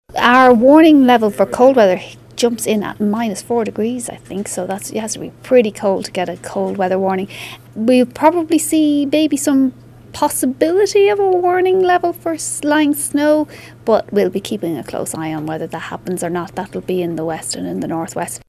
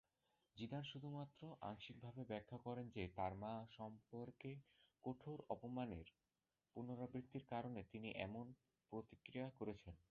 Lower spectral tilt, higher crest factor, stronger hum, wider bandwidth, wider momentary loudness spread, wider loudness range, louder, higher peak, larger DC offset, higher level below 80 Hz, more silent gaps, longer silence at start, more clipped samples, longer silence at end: about the same, -4.5 dB/octave vs -5.5 dB/octave; second, 16 dB vs 24 dB; neither; first, 15.5 kHz vs 6.8 kHz; first, 13 LU vs 7 LU; first, 7 LU vs 2 LU; first, -15 LUFS vs -53 LUFS; first, 0 dBFS vs -30 dBFS; neither; first, -52 dBFS vs -72 dBFS; neither; second, 0.1 s vs 0.55 s; neither; about the same, 0.1 s vs 0.15 s